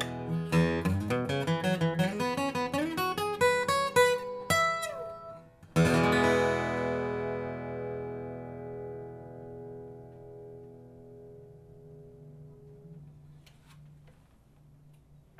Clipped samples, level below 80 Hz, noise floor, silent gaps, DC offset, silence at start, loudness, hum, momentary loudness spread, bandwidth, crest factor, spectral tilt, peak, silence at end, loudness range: under 0.1%; -56 dBFS; -60 dBFS; none; under 0.1%; 0 s; -29 LUFS; none; 26 LU; 15.5 kHz; 22 dB; -5.5 dB/octave; -10 dBFS; 0.5 s; 21 LU